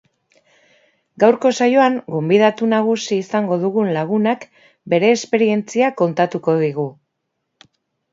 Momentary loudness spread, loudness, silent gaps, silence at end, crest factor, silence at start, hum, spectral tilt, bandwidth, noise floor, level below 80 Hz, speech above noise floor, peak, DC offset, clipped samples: 6 LU; -17 LUFS; none; 1.2 s; 18 dB; 1.2 s; none; -6 dB/octave; 7.8 kHz; -74 dBFS; -68 dBFS; 58 dB; 0 dBFS; under 0.1%; under 0.1%